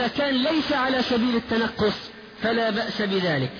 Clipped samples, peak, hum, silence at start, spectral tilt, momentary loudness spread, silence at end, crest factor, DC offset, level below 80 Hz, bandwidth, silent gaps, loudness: under 0.1%; -12 dBFS; none; 0 s; -6 dB/octave; 4 LU; 0 s; 10 dB; under 0.1%; -52 dBFS; 5.4 kHz; none; -23 LUFS